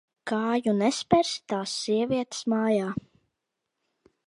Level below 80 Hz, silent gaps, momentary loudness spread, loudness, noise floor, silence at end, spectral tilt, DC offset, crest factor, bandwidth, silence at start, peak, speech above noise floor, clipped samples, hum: -62 dBFS; none; 7 LU; -26 LUFS; -83 dBFS; 1.25 s; -4.5 dB/octave; under 0.1%; 22 dB; 11.5 kHz; 0.25 s; -6 dBFS; 57 dB; under 0.1%; none